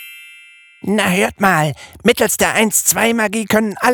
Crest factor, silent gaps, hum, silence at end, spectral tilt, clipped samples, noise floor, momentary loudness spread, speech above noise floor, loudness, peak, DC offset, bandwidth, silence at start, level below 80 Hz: 16 dB; none; none; 0 s; -3.5 dB/octave; under 0.1%; -43 dBFS; 7 LU; 28 dB; -15 LUFS; 0 dBFS; under 0.1%; over 20 kHz; 0 s; -50 dBFS